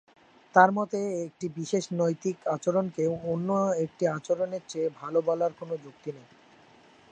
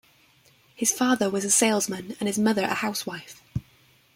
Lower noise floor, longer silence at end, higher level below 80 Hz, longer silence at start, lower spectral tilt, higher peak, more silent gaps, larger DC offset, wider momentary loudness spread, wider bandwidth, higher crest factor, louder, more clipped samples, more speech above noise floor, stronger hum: about the same, -57 dBFS vs -59 dBFS; first, 0.9 s vs 0.55 s; second, -72 dBFS vs -58 dBFS; second, 0.55 s vs 0.8 s; first, -6 dB/octave vs -3 dB/octave; about the same, -6 dBFS vs -6 dBFS; neither; neither; about the same, 14 LU vs 16 LU; second, 9.4 kHz vs 16.5 kHz; about the same, 24 dB vs 22 dB; second, -28 LUFS vs -24 LUFS; neither; second, 29 dB vs 35 dB; neither